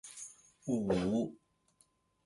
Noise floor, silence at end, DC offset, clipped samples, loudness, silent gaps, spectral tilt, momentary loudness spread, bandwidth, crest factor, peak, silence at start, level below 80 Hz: -73 dBFS; 0.9 s; under 0.1%; under 0.1%; -36 LUFS; none; -6 dB/octave; 16 LU; 11.5 kHz; 18 dB; -20 dBFS; 0.05 s; -62 dBFS